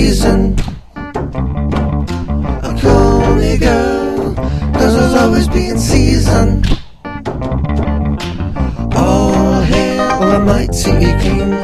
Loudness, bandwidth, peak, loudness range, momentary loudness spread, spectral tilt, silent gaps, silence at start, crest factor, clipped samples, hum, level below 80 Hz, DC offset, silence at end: -13 LUFS; 14.5 kHz; 0 dBFS; 3 LU; 9 LU; -6 dB/octave; none; 0 s; 12 dB; under 0.1%; none; -18 dBFS; under 0.1%; 0 s